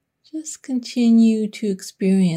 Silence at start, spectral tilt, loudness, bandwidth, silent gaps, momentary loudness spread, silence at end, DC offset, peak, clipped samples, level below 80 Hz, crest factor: 0.35 s; -6.5 dB/octave; -19 LUFS; 12.5 kHz; none; 17 LU; 0 s; under 0.1%; -8 dBFS; under 0.1%; -68 dBFS; 12 dB